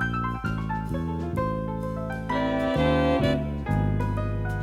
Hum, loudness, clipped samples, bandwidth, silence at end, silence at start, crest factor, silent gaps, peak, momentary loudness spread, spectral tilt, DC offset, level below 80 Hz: none; -27 LUFS; under 0.1%; 13.5 kHz; 0 s; 0 s; 14 dB; none; -12 dBFS; 8 LU; -8 dB/octave; under 0.1%; -36 dBFS